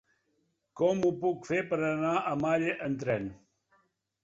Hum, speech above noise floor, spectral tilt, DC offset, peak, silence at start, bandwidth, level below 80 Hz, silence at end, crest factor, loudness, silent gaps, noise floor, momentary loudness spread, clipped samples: none; 46 dB; -6.5 dB/octave; under 0.1%; -16 dBFS; 0.75 s; 7.8 kHz; -66 dBFS; 0.85 s; 16 dB; -30 LUFS; none; -76 dBFS; 5 LU; under 0.1%